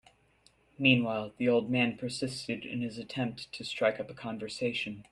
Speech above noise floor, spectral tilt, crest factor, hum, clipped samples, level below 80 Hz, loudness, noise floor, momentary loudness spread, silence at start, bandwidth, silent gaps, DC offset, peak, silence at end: 35 dB; -5.5 dB/octave; 22 dB; none; under 0.1%; -68 dBFS; -31 LUFS; -66 dBFS; 13 LU; 0.8 s; 11.5 kHz; none; under 0.1%; -10 dBFS; 0.1 s